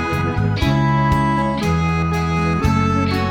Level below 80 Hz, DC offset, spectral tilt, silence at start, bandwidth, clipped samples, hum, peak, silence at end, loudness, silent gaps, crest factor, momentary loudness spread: -30 dBFS; under 0.1%; -7 dB/octave; 0 s; 15.5 kHz; under 0.1%; none; -2 dBFS; 0 s; -18 LUFS; none; 14 dB; 3 LU